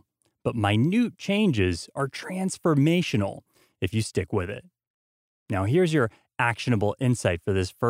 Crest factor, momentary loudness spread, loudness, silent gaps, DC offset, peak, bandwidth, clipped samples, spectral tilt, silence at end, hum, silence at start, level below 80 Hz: 18 dB; 9 LU; -25 LUFS; 4.87-5.46 s; under 0.1%; -8 dBFS; 16 kHz; under 0.1%; -6 dB/octave; 0 s; none; 0.45 s; -54 dBFS